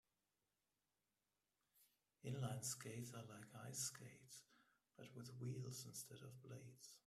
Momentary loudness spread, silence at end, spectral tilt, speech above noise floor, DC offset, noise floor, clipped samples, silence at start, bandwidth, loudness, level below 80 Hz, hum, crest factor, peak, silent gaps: 14 LU; 0.1 s; -4 dB/octave; over 36 dB; under 0.1%; under -90 dBFS; under 0.1%; 1.75 s; 15.5 kHz; -53 LUFS; -86 dBFS; none; 20 dB; -36 dBFS; none